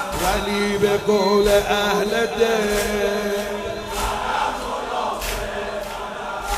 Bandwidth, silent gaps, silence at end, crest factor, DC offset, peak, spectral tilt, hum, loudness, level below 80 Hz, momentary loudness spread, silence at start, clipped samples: 16 kHz; none; 0 s; 16 dB; under 0.1%; -4 dBFS; -3.5 dB/octave; none; -21 LUFS; -36 dBFS; 10 LU; 0 s; under 0.1%